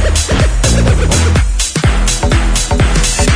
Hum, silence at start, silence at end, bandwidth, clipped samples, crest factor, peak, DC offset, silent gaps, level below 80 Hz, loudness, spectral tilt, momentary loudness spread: none; 0 s; 0 s; 11 kHz; under 0.1%; 10 dB; 0 dBFS; under 0.1%; none; -12 dBFS; -12 LUFS; -4 dB/octave; 2 LU